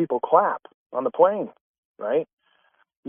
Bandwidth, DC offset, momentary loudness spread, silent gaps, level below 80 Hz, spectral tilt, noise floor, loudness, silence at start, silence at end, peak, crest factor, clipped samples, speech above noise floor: 3.6 kHz; under 0.1%; 14 LU; 0.74-0.90 s, 1.61-1.95 s, 2.33-2.37 s, 2.97-3.03 s; -80 dBFS; -5.5 dB/octave; -65 dBFS; -23 LUFS; 0 s; 0 s; -4 dBFS; 22 dB; under 0.1%; 43 dB